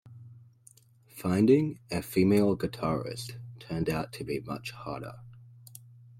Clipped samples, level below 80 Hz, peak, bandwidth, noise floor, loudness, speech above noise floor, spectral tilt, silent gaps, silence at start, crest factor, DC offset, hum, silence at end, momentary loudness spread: under 0.1%; -58 dBFS; -12 dBFS; 16.5 kHz; -59 dBFS; -29 LUFS; 31 dB; -7 dB/octave; none; 0.05 s; 18 dB; under 0.1%; none; 0.4 s; 26 LU